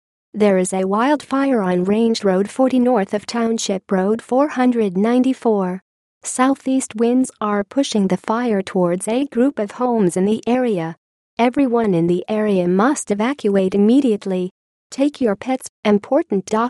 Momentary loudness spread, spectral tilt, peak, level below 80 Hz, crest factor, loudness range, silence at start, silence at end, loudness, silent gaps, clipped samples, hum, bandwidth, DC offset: 5 LU; -6 dB/octave; -4 dBFS; -62 dBFS; 14 dB; 2 LU; 0.35 s; 0 s; -18 LUFS; 5.82-6.21 s, 10.98-11.37 s, 14.51-14.90 s, 15.69-15.83 s; under 0.1%; none; 12 kHz; under 0.1%